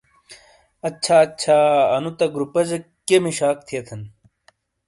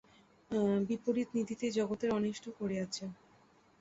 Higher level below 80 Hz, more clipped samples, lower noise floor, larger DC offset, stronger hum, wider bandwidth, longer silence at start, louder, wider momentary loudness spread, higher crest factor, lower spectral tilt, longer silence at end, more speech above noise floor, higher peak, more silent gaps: first, -62 dBFS vs -70 dBFS; neither; second, -60 dBFS vs -66 dBFS; neither; neither; first, 11.5 kHz vs 8 kHz; second, 0.3 s vs 0.5 s; first, -19 LUFS vs -35 LUFS; first, 14 LU vs 8 LU; about the same, 18 dB vs 16 dB; second, -4.5 dB/octave vs -6 dB/octave; first, 0.8 s vs 0.65 s; first, 41 dB vs 31 dB; first, -4 dBFS vs -20 dBFS; neither